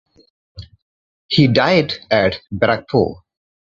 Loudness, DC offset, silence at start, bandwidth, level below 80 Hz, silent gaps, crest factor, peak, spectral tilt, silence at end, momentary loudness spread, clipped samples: -16 LUFS; under 0.1%; 0.55 s; 7.6 kHz; -46 dBFS; 0.82-1.29 s; 18 dB; 0 dBFS; -7 dB/octave; 0.55 s; 6 LU; under 0.1%